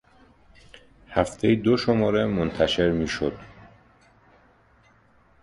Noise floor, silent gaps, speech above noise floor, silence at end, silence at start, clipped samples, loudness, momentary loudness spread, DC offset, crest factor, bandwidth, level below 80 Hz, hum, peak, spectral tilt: -59 dBFS; none; 36 dB; 1.95 s; 0.75 s; under 0.1%; -23 LUFS; 7 LU; under 0.1%; 20 dB; 11.5 kHz; -46 dBFS; none; -6 dBFS; -6 dB/octave